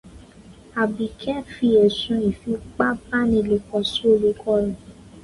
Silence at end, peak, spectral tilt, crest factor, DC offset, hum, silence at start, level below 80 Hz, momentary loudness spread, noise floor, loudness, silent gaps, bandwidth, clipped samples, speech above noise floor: 0.05 s; -4 dBFS; -6 dB/octave; 18 dB; under 0.1%; none; 0.05 s; -46 dBFS; 11 LU; -46 dBFS; -21 LUFS; none; 11.5 kHz; under 0.1%; 25 dB